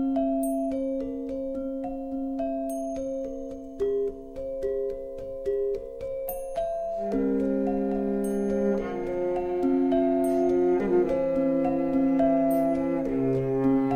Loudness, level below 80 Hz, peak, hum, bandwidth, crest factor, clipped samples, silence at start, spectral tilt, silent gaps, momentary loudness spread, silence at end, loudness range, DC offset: -27 LUFS; -48 dBFS; -12 dBFS; none; 15 kHz; 14 dB; under 0.1%; 0 s; -8 dB/octave; none; 10 LU; 0 s; 7 LU; under 0.1%